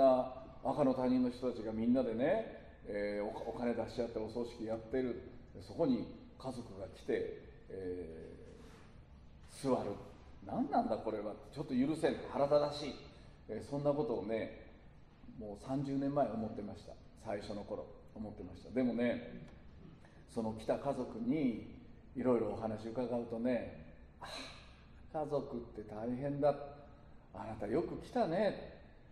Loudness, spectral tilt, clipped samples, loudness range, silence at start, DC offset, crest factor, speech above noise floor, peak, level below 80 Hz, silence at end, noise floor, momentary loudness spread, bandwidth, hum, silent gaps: -38 LUFS; -7 dB/octave; under 0.1%; 5 LU; 0 s; under 0.1%; 20 dB; 21 dB; -18 dBFS; -60 dBFS; 0.05 s; -58 dBFS; 20 LU; 11 kHz; none; none